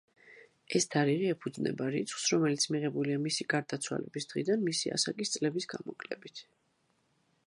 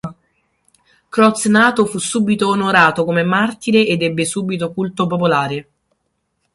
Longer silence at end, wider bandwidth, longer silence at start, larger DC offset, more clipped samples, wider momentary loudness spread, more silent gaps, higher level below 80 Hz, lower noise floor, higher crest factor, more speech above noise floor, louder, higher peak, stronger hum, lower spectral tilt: first, 1.05 s vs 0.9 s; about the same, 11.5 kHz vs 11.5 kHz; first, 0.25 s vs 0.05 s; neither; neither; first, 13 LU vs 9 LU; neither; second, -78 dBFS vs -56 dBFS; first, -75 dBFS vs -69 dBFS; about the same, 20 dB vs 16 dB; second, 42 dB vs 54 dB; second, -32 LUFS vs -15 LUFS; second, -14 dBFS vs 0 dBFS; neither; about the same, -4 dB/octave vs -4.5 dB/octave